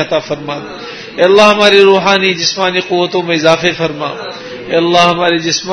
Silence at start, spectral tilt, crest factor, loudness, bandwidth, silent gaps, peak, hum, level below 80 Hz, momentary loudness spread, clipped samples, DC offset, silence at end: 0 s; -3.5 dB/octave; 12 dB; -10 LUFS; 11 kHz; none; 0 dBFS; none; -50 dBFS; 17 LU; 0.5%; under 0.1%; 0 s